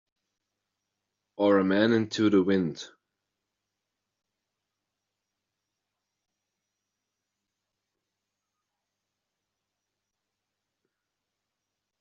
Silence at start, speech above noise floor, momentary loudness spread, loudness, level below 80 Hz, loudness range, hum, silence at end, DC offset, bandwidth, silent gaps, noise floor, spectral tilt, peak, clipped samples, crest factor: 1.4 s; 62 dB; 8 LU; -25 LUFS; -76 dBFS; 7 LU; 50 Hz at -60 dBFS; 9.15 s; under 0.1%; 7.4 kHz; none; -86 dBFS; -5 dB/octave; -10 dBFS; under 0.1%; 22 dB